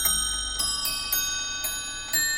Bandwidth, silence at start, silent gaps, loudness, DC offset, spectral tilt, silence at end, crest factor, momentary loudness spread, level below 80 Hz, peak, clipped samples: 17 kHz; 0 s; none; -25 LUFS; under 0.1%; 1 dB/octave; 0 s; 18 dB; 4 LU; -44 dBFS; -10 dBFS; under 0.1%